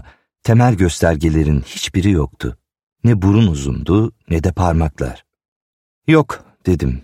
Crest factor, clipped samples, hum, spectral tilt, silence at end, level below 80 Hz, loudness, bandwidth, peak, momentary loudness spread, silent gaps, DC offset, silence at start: 16 dB; under 0.1%; none; -7 dB/octave; 0 s; -28 dBFS; -16 LUFS; 14 kHz; 0 dBFS; 11 LU; 2.83-2.96 s, 5.48-6.02 s; under 0.1%; 0.45 s